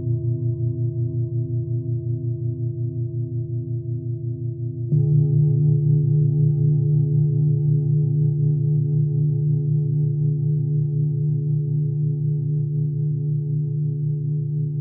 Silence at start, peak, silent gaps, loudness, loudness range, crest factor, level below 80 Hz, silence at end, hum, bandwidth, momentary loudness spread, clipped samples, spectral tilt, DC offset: 0 s; -10 dBFS; none; -22 LUFS; 7 LU; 12 dB; -70 dBFS; 0 s; none; 0.8 kHz; 8 LU; under 0.1%; -18 dB/octave; under 0.1%